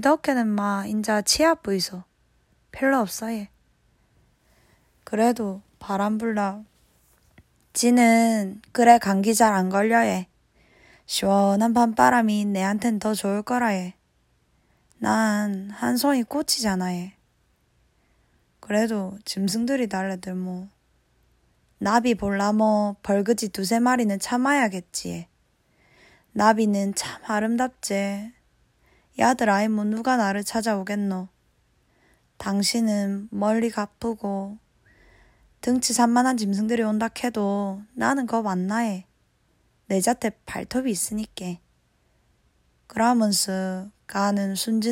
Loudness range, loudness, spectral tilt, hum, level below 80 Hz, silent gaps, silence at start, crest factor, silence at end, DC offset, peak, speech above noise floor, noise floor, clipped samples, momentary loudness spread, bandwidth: 7 LU; -23 LUFS; -4.5 dB/octave; none; -60 dBFS; none; 0 s; 22 dB; 0 s; under 0.1%; -2 dBFS; 43 dB; -66 dBFS; under 0.1%; 12 LU; 16 kHz